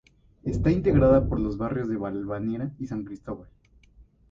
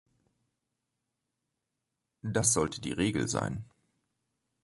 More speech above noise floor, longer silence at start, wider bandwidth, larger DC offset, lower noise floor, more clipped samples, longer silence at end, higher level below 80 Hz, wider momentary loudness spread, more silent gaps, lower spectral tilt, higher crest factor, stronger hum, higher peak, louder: second, 31 dB vs 55 dB; second, 0.45 s vs 2.25 s; second, 7.6 kHz vs 12 kHz; neither; second, -56 dBFS vs -85 dBFS; neither; second, 0.3 s vs 1 s; first, -38 dBFS vs -58 dBFS; first, 17 LU vs 13 LU; neither; first, -10 dB/octave vs -4 dB/octave; second, 18 dB vs 24 dB; neither; first, -8 dBFS vs -12 dBFS; first, -26 LUFS vs -30 LUFS